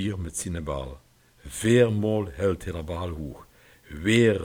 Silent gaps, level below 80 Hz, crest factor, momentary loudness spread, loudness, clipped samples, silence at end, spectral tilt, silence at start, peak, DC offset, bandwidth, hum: none; -44 dBFS; 18 dB; 19 LU; -26 LUFS; under 0.1%; 0 s; -5.5 dB/octave; 0 s; -8 dBFS; under 0.1%; 17 kHz; none